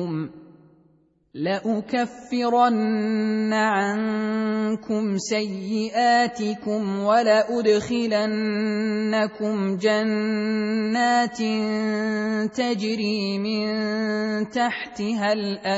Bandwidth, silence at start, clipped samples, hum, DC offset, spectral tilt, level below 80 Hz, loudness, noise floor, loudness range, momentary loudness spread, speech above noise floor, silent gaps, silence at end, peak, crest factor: 8 kHz; 0 s; under 0.1%; none; under 0.1%; -5.5 dB/octave; -64 dBFS; -23 LUFS; -61 dBFS; 3 LU; 7 LU; 38 dB; none; 0 s; -6 dBFS; 16 dB